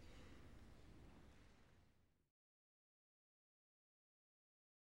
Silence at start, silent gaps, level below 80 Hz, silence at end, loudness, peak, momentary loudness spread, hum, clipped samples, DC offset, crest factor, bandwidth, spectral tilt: 0 s; none; -72 dBFS; 2.5 s; -66 LUFS; -50 dBFS; 4 LU; none; under 0.1%; under 0.1%; 18 dB; 16 kHz; -5.5 dB/octave